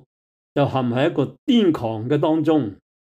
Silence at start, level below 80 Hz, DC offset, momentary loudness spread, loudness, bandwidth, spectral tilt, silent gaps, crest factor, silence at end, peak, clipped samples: 0.55 s; -60 dBFS; under 0.1%; 7 LU; -20 LUFS; 8.4 kHz; -8 dB/octave; 1.38-1.47 s; 14 dB; 0.4 s; -6 dBFS; under 0.1%